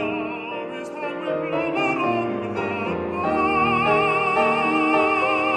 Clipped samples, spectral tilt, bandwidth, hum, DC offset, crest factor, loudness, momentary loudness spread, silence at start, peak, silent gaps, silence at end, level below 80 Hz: under 0.1%; -6 dB/octave; 10 kHz; none; under 0.1%; 16 dB; -22 LUFS; 11 LU; 0 s; -6 dBFS; none; 0 s; -54 dBFS